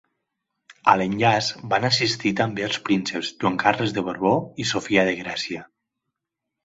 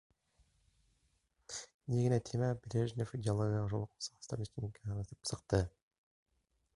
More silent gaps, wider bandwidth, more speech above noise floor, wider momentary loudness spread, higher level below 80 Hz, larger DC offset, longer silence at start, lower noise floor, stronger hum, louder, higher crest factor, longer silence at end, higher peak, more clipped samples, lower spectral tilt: second, none vs 1.74-1.80 s; second, 8 kHz vs 11.5 kHz; first, 61 dB vs 41 dB; second, 8 LU vs 11 LU; about the same, -58 dBFS vs -58 dBFS; neither; second, 0.7 s vs 1.5 s; first, -84 dBFS vs -78 dBFS; neither; first, -22 LUFS vs -38 LUFS; about the same, 22 dB vs 22 dB; about the same, 1 s vs 1.05 s; first, -2 dBFS vs -18 dBFS; neither; second, -4.5 dB/octave vs -6 dB/octave